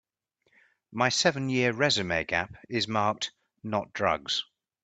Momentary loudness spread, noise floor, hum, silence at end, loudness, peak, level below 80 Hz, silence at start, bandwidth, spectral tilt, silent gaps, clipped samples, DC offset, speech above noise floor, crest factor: 10 LU; -75 dBFS; none; 0.4 s; -28 LUFS; -8 dBFS; -62 dBFS; 0.9 s; 9.4 kHz; -3.5 dB/octave; none; under 0.1%; under 0.1%; 47 dB; 22 dB